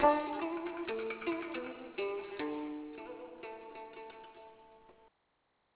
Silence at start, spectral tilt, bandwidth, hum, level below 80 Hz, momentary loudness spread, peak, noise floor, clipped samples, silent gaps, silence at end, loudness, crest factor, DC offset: 0 s; -2.5 dB/octave; 4 kHz; none; -68 dBFS; 16 LU; -12 dBFS; -78 dBFS; under 0.1%; none; 0.7 s; -40 LUFS; 26 dB; under 0.1%